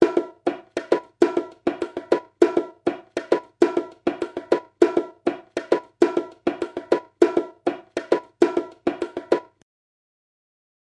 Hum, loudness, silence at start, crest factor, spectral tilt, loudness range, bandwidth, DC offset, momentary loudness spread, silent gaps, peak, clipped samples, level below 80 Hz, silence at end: none; -24 LUFS; 0 s; 24 dB; -5.5 dB/octave; 2 LU; 10.5 kHz; under 0.1%; 8 LU; none; 0 dBFS; under 0.1%; -64 dBFS; 1.55 s